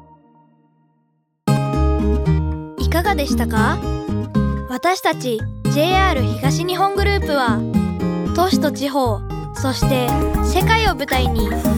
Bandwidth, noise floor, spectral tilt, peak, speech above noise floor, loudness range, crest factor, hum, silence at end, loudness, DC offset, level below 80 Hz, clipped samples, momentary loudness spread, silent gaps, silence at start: 19.5 kHz; -65 dBFS; -6 dB/octave; -2 dBFS; 47 dB; 2 LU; 16 dB; none; 0 s; -18 LUFS; under 0.1%; -26 dBFS; under 0.1%; 7 LU; none; 1.45 s